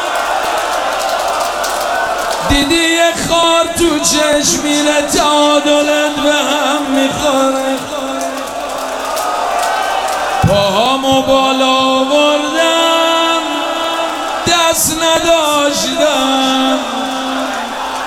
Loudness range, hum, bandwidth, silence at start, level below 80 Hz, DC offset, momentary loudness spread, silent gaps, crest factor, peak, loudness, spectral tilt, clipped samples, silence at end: 4 LU; none; 19 kHz; 0 s; -36 dBFS; under 0.1%; 7 LU; none; 12 dB; 0 dBFS; -12 LUFS; -2.5 dB/octave; under 0.1%; 0 s